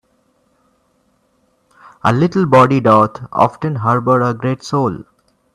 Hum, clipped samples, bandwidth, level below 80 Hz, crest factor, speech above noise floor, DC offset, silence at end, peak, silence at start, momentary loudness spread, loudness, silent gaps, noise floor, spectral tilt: none; under 0.1%; 12 kHz; -52 dBFS; 16 dB; 47 dB; under 0.1%; 0.55 s; 0 dBFS; 2.05 s; 9 LU; -14 LUFS; none; -60 dBFS; -7.5 dB/octave